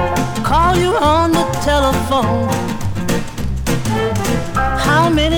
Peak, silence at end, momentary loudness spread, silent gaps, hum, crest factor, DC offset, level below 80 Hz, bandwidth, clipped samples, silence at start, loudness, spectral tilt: -2 dBFS; 0 s; 8 LU; none; none; 14 dB; under 0.1%; -26 dBFS; 20 kHz; under 0.1%; 0 s; -16 LUFS; -5 dB/octave